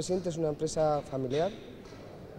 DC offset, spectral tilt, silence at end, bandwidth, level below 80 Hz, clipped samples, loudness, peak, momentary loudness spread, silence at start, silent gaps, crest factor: under 0.1%; -5.5 dB/octave; 0 s; 15.5 kHz; -56 dBFS; under 0.1%; -31 LUFS; -18 dBFS; 18 LU; 0 s; none; 16 dB